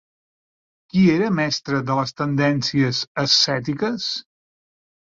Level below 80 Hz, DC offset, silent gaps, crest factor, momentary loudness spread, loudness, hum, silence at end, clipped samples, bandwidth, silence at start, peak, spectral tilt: -58 dBFS; under 0.1%; 3.07-3.15 s; 18 dB; 8 LU; -20 LUFS; none; 0.85 s; under 0.1%; 7.6 kHz; 0.95 s; -4 dBFS; -5 dB/octave